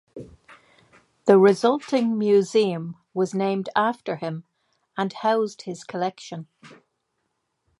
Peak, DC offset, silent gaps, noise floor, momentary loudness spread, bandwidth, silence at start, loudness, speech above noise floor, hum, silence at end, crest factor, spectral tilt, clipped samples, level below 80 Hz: -2 dBFS; under 0.1%; none; -76 dBFS; 20 LU; 11.5 kHz; 0.15 s; -22 LUFS; 54 dB; none; 1.05 s; 22 dB; -6 dB/octave; under 0.1%; -68 dBFS